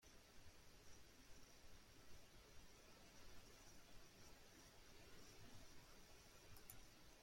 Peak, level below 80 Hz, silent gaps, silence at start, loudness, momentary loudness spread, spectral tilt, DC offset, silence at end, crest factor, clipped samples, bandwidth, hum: -42 dBFS; -72 dBFS; none; 0 s; -66 LUFS; 4 LU; -3 dB/octave; under 0.1%; 0 s; 22 dB; under 0.1%; 16.5 kHz; none